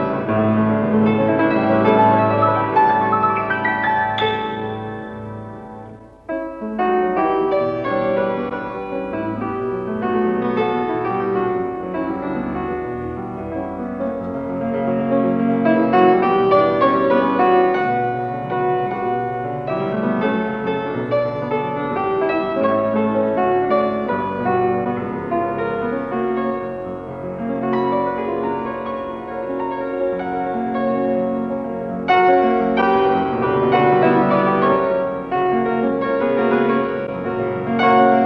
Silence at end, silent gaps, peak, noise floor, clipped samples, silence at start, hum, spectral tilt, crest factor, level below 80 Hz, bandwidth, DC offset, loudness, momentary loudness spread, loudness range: 0 s; none; -2 dBFS; -38 dBFS; under 0.1%; 0 s; none; -9 dB/octave; 16 dB; -50 dBFS; 5.6 kHz; under 0.1%; -19 LUFS; 11 LU; 7 LU